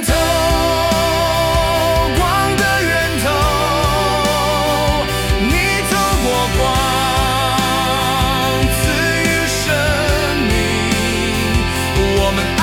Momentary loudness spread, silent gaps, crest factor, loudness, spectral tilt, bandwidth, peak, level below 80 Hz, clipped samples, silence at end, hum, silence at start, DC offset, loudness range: 2 LU; none; 12 dB; -15 LUFS; -4 dB/octave; 18 kHz; -2 dBFS; -24 dBFS; under 0.1%; 0 s; none; 0 s; under 0.1%; 1 LU